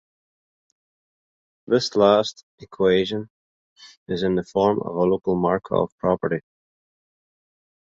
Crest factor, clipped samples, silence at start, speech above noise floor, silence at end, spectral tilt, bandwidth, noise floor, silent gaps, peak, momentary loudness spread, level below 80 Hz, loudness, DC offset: 20 dB; under 0.1%; 1.7 s; over 69 dB; 1.55 s; -6 dB/octave; 7.8 kHz; under -90 dBFS; 2.43-2.58 s, 3.30-3.76 s, 3.97-4.06 s, 5.92-5.98 s; -4 dBFS; 12 LU; -56 dBFS; -22 LUFS; under 0.1%